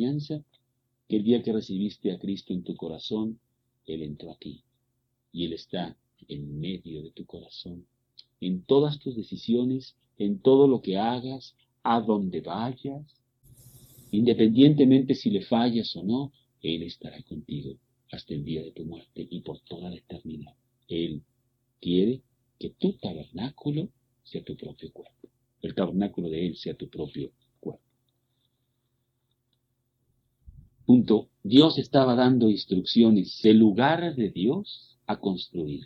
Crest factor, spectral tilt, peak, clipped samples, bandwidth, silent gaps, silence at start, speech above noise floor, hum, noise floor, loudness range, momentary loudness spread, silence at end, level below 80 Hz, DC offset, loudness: 22 dB; -8 dB/octave; -4 dBFS; under 0.1%; 6.4 kHz; none; 0 s; 51 dB; none; -76 dBFS; 16 LU; 21 LU; 0 s; -62 dBFS; under 0.1%; -25 LUFS